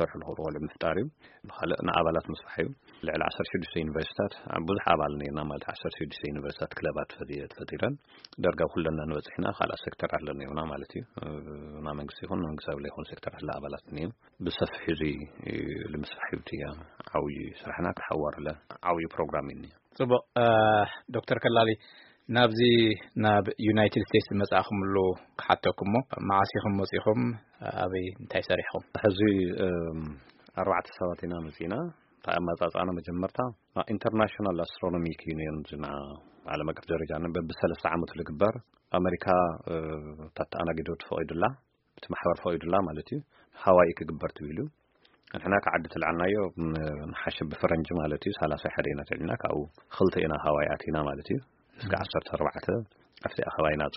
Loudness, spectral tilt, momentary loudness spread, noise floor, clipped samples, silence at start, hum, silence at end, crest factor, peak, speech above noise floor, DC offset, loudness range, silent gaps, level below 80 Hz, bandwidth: -30 LUFS; -4.5 dB/octave; 13 LU; -66 dBFS; under 0.1%; 0 s; none; 0 s; 26 dB; -4 dBFS; 36 dB; under 0.1%; 9 LU; none; -52 dBFS; 5.8 kHz